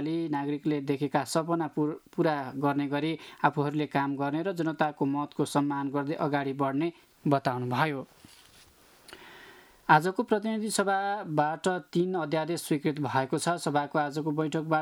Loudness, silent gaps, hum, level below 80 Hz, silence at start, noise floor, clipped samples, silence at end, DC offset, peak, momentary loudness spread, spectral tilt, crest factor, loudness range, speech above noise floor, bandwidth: -29 LUFS; none; none; -74 dBFS; 0 s; -58 dBFS; under 0.1%; 0 s; under 0.1%; -6 dBFS; 4 LU; -5.5 dB/octave; 24 dB; 3 LU; 29 dB; 18 kHz